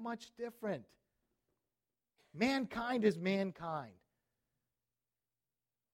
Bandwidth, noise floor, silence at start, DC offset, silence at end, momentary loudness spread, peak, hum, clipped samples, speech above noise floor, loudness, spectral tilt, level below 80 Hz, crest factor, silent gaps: 16 kHz; under -90 dBFS; 0 s; under 0.1%; 2 s; 13 LU; -18 dBFS; none; under 0.1%; over 52 dB; -38 LUFS; -6 dB/octave; -74 dBFS; 22 dB; none